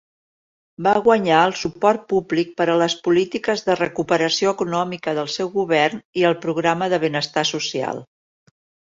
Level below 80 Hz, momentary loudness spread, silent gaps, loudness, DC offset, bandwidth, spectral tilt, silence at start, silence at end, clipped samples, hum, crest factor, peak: -60 dBFS; 7 LU; 6.05-6.13 s; -20 LUFS; under 0.1%; 7.8 kHz; -4.5 dB/octave; 0.8 s; 0.75 s; under 0.1%; none; 18 dB; -2 dBFS